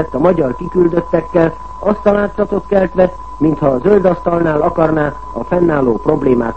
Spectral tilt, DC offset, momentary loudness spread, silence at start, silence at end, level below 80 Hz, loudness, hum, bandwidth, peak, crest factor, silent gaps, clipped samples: -9.5 dB/octave; 2%; 5 LU; 0 s; 0 s; -34 dBFS; -14 LUFS; none; 8.2 kHz; 0 dBFS; 14 dB; none; under 0.1%